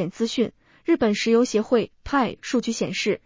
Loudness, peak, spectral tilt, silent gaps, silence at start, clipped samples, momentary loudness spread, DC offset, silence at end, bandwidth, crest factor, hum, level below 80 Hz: -23 LUFS; -6 dBFS; -4.5 dB/octave; none; 0 s; under 0.1%; 6 LU; under 0.1%; 0.1 s; 7.6 kHz; 16 dB; none; -52 dBFS